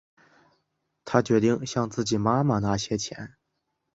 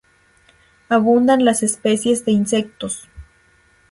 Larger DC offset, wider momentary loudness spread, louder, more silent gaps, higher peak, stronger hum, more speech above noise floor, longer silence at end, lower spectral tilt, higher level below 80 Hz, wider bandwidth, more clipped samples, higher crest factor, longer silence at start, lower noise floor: neither; about the same, 15 LU vs 13 LU; second, -25 LUFS vs -17 LUFS; neither; about the same, -4 dBFS vs -2 dBFS; neither; first, 54 dB vs 39 dB; about the same, 0.65 s vs 0.7 s; about the same, -5.5 dB/octave vs -4.5 dB/octave; about the same, -54 dBFS vs -52 dBFS; second, 8 kHz vs 11.5 kHz; neither; first, 24 dB vs 16 dB; first, 1.05 s vs 0.9 s; first, -79 dBFS vs -55 dBFS